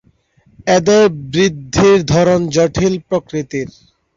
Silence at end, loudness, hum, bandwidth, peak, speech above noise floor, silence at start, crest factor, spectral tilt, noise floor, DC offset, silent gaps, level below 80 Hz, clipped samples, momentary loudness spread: 0.45 s; -14 LUFS; none; 7.8 kHz; 0 dBFS; 40 dB; 0.65 s; 14 dB; -5.5 dB/octave; -54 dBFS; under 0.1%; none; -40 dBFS; under 0.1%; 12 LU